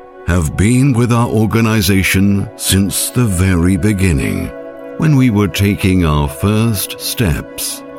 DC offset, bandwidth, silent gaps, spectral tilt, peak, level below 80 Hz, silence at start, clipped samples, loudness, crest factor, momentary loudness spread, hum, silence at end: under 0.1%; 17.5 kHz; none; -5.5 dB/octave; 0 dBFS; -28 dBFS; 0 s; under 0.1%; -13 LUFS; 14 dB; 7 LU; none; 0 s